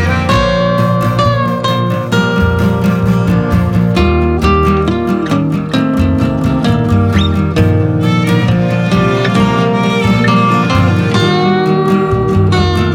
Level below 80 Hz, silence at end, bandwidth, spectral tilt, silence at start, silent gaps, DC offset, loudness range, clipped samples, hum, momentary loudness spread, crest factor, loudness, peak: -26 dBFS; 0 s; 16 kHz; -7 dB/octave; 0 s; none; under 0.1%; 1 LU; under 0.1%; none; 3 LU; 10 dB; -12 LUFS; 0 dBFS